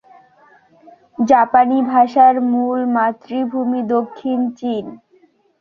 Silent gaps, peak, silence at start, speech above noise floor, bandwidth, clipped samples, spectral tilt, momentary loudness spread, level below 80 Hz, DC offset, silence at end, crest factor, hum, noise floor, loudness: none; -2 dBFS; 1.2 s; 39 dB; 6.6 kHz; under 0.1%; -6.5 dB/octave; 12 LU; -62 dBFS; under 0.1%; 0.65 s; 16 dB; none; -55 dBFS; -16 LUFS